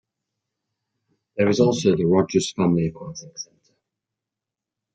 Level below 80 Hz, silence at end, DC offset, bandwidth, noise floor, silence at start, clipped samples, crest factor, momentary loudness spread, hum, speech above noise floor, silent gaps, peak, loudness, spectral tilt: -60 dBFS; 1.5 s; under 0.1%; 9.2 kHz; -87 dBFS; 1.35 s; under 0.1%; 20 dB; 18 LU; none; 66 dB; none; -4 dBFS; -20 LUFS; -6 dB/octave